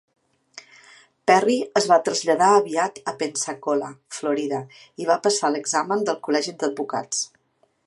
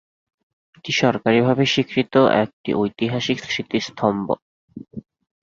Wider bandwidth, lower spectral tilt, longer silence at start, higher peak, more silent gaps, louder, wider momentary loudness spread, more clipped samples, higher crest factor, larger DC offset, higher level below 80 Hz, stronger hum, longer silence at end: first, 11.5 kHz vs 7.6 kHz; second, -3 dB/octave vs -5.5 dB/octave; second, 0.55 s vs 0.85 s; about the same, -2 dBFS vs -2 dBFS; second, none vs 2.53-2.64 s, 4.42-4.68 s; about the same, -22 LUFS vs -20 LUFS; second, 11 LU vs 18 LU; neither; about the same, 20 dB vs 20 dB; neither; second, -76 dBFS vs -58 dBFS; neither; first, 0.6 s vs 0.4 s